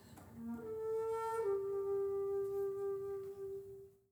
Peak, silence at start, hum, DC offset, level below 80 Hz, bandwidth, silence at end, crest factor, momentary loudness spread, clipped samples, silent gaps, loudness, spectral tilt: -30 dBFS; 0 s; none; under 0.1%; -72 dBFS; 20 kHz; 0.2 s; 12 dB; 12 LU; under 0.1%; none; -41 LUFS; -7 dB/octave